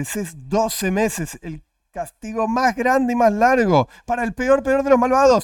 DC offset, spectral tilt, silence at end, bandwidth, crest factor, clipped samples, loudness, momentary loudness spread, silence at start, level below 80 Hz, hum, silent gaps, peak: under 0.1%; -5 dB/octave; 0 s; 17 kHz; 16 dB; under 0.1%; -19 LUFS; 17 LU; 0 s; -44 dBFS; none; none; -2 dBFS